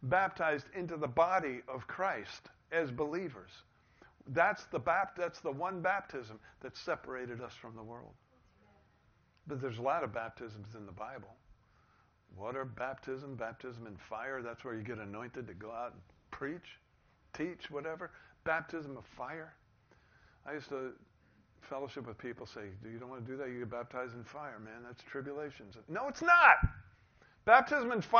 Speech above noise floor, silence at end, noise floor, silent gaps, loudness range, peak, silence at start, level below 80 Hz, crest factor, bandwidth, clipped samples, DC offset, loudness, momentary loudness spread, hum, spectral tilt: 34 dB; 0 s; -70 dBFS; none; 15 LU; -8 dBFS; 0 s; -58 dBFS; 28 dB; 6.6 kHz; under 0.1%; under 0.1%; -35 LUFS; 18 LU; none; -3.5 dB/octave